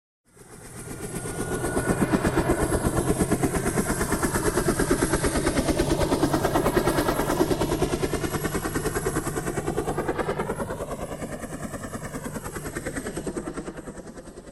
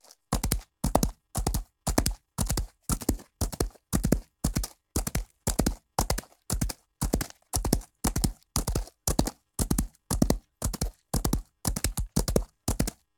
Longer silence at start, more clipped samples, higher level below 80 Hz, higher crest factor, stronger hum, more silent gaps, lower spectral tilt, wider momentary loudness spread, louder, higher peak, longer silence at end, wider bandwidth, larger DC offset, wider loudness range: about the same, 0.35 s vs 0.3 s; neither; about the same, -38 dBFS vs -34 dBFS; second, 20 dB vs 28 dB; neither; neither; about the same, -5 dB/octave vs -4.5 dB/octave; first, 11 LU vs 6 LU; first, -26 LUFS vs -31 LUFS; second, -6 dBFS vs -2 dBFS; second, 0 s vs 0.25 s; second, 16 kHz vs 19 kHz; neither; first, 9 LU vs 1 LU